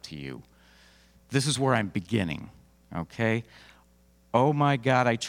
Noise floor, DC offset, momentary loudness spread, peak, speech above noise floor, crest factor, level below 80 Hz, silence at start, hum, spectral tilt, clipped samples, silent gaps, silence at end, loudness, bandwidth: -61 dBFS; under 0.1%; 16 LU; -8 dBFS; 34 dB; 20 dB; -60 dBFS; 0.05 s; none; -5.5 dB/octave; under 0.1%; none; 0 s; -27 LUFS; 15.5 kHz